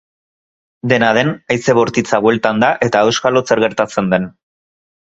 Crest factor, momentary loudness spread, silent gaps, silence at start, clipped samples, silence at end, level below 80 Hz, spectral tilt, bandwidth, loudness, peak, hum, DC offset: 16 dB; 4 LU; none; 0.85 s; under 0.1%; 0.75 s; -52 dBFS; -5 dB/octave; 8.2 kHz; -14 LUFS; 0 dBFS; none; under 0.1%